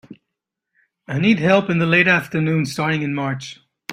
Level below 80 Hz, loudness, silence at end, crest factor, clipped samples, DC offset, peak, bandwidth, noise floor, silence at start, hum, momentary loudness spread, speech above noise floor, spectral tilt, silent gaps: -58 dBFS; -18 LUFS; 0 s; 18 dB; under 0.1%; under 0.1%; -2 dBFS; 14.5 kHz; -81 dBFS; 0.1 s; none; 14 LU; 63 dB; -6 dB/octave; none